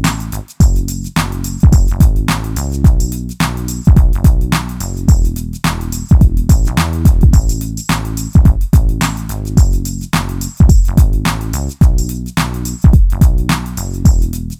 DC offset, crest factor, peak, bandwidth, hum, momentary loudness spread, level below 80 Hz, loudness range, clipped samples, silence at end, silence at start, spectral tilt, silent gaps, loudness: under 0.1%; 10 dB; 0 dBFS; 16 kHz; none; 9 LU; -14 dBFS; 1 LU; under 0.1%; 0.05 s; 0 s; -6 dB/octave; none; -14 LUFS